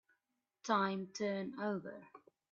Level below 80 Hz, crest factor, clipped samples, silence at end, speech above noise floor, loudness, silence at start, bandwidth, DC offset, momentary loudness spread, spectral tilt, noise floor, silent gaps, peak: -86 dBFS; 22 dB; under 0.1%; 0.35 s; 48 dB; -39 LUFS; 0.65 s; 7.6 kHz; under 0.1%; 16 LU; -4 dB/octave; -87 dBFS; none; -20 dBFS